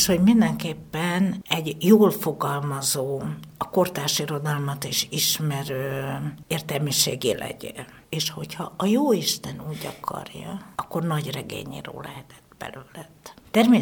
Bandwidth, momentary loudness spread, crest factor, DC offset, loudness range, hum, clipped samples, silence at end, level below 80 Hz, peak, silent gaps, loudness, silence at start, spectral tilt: over 20 kHz; 18 LU; 20 dB; under 0.1%; 9 LU; none; under 0.1%; 0 s; -56 dBFS; -4 dBFS; none; -24 LUFS; 0 s; -4.5 dB/octave